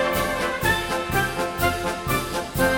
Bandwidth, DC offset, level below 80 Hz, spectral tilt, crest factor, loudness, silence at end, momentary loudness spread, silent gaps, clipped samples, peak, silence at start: 17.5 kHz; under 0.1%; -38 dBFS; -4 dB/octave; 16 dB; -23 LUFS; 0 s; 3 LU; none; under 0.1%; -6 dBFS; 0 s